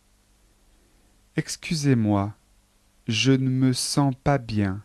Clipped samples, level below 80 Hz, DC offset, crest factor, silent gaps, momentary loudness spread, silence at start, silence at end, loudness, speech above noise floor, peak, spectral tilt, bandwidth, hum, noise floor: under 0.1%; -52 dBFS; under 0.1%; 16 dB; none; 11 LU; 1.35 s; 0.05 s; -24 LUFS; 38 dB; -8 dBFS; -5.5 dB/octave; 13 kHz; 50 Hz at -50 dBFS; -61 dBFS